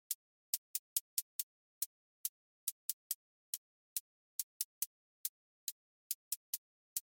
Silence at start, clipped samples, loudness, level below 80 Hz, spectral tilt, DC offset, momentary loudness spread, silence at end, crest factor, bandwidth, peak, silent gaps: 0.1 s; under 0.1%; -43 LUFS; under -90 dBFS; 9 dB/octave; under 0.1%; 7 LU; 0.05 s; 28 dB; 17 kHz; -18 dBFS; 0.15-6.96 s